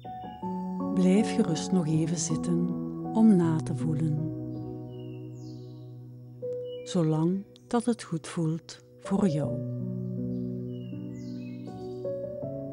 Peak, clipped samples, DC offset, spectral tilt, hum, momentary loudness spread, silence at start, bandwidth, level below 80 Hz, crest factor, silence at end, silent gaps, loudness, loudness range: -12 dBFS; under 0.1%; under 0.1%; -7 dB/octave; none; 17 LU; 0 s; 11.5 kHz; -60 dBFS; 18 dB; 0 s; none; -29 LUFS; 9 LU